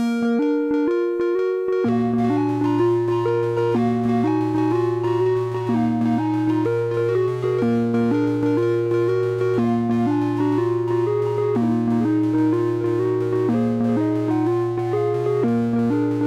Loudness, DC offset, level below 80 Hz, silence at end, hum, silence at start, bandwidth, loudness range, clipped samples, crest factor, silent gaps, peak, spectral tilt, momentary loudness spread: -20 LUFS; under 0.1%; -58 dBFS; 0 s; none; 0 s; 9.8 kHz; 1 LU; under 0.1%; 8 dB; none; -10 dBFS; -9 dB/octave; 2 LU